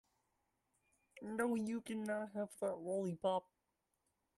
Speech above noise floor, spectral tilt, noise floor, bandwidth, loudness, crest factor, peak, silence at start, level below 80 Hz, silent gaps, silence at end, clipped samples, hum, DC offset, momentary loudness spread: 45 dB; -6 dB/octave; -86 dBFS; 13 kHz; -42 LUFS; 18 dB; -26 dBFS; 1.15 s; -82 dBFS; none; 0.95 s; under 0.1%; none; under 0.1%; 6 LU